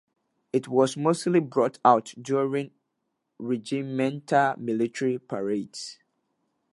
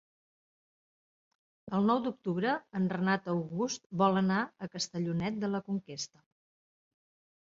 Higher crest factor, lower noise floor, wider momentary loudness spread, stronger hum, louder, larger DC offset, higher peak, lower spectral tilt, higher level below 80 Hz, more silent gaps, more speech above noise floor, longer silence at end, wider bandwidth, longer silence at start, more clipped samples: about the same, 22 dB vs 20 dB; second, -79 dBFS vs under -90 dBFS; about the same, 10 LU vs 9 LU; neither; first, -26 LUFS vs -32 LUFS; neither; first, -4 dBFS vs -14 dBFS; about the same, -6 dB/octave vs -5.5 dB/octave; about the same, -76 dBFS vs -72 dBFS; second, none vs 3.86-3.90 s; second, 54 dB vs over 58 dB; second, 0.8 s vs 1.35 s; first, 11.5 kHz vs 7.8 kHz; second, 0.55 s vs 1.65 s; neither